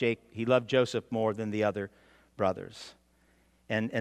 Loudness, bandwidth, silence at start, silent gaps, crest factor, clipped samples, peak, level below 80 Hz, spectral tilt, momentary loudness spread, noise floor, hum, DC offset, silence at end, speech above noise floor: -30 LUFS; 12.5 kHz; 0 s; none; 20 dB; under 0.1%; -10 dBFS; -70 dBFS; -6 dB/octave; 16 LU; -66 dBFS; none; under 0.1%; 0 s; 36 dB